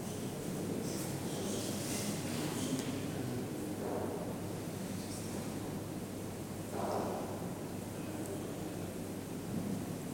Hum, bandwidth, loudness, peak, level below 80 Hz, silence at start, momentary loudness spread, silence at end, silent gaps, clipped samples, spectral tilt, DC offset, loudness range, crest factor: none; 19.5 kHz; -40 LUFS; -22 dBFS; -62 dBFS; 0 s; 5 LU; 0 s; none; under 0.1%; -5 dB/octave; under 0.1%; 3 LU; 16 dB